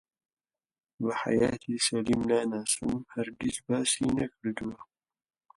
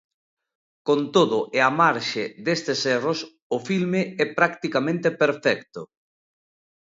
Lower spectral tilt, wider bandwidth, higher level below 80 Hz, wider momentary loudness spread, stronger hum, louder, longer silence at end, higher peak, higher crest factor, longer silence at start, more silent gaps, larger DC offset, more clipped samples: about the same, -4 dB/octave vs -5 dB/octave; first, 11.5 kHz vs 7.8 kHz; first, -58 dBFS vs -70 dBFS; about the same, 8 LU vs 10 LU; neither; second, -30 LUFS vs -23 LUFS; second, 0.75 s vs 1 s; second, -12 dBFS vs -2 dBFS; about the same, 18 dB vs 22 dB; first, 1 s vs 0.85 s; second, none vs 3.42-3.50 s; neither; neither